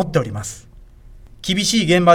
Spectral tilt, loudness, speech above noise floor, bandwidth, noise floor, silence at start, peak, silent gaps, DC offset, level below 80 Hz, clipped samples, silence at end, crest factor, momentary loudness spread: -4.5 dB/octave; -19 LUFS; 25 dB; 16.5 kHz; -42 dBFS; 0 s; 0 dBFS; none; under 0.1%; -42 dBFS; under 0.1%; 0 s; 18 dB; 16 LU